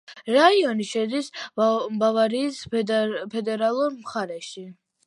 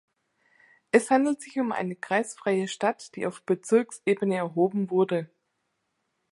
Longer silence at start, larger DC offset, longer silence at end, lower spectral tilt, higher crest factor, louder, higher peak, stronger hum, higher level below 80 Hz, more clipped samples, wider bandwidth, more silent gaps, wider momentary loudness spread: second, 0.1 s vs 0.95 s; neither; second, 0.35 s vs 1.05 s; about the same, -4.5 dB/octave vs -5.5 dB/octave; about the same, 20 dB vs 22 dB; first, -23 LUFS vs -26 LUFS; about the same, -4 dBFS vs -4 dBFS; neither; first, -70 dBFS vs -78 dBFS; neither; about the same, 11.5 kHz vs 11.5 kHz; neither; first, 13 LU vs 8 LU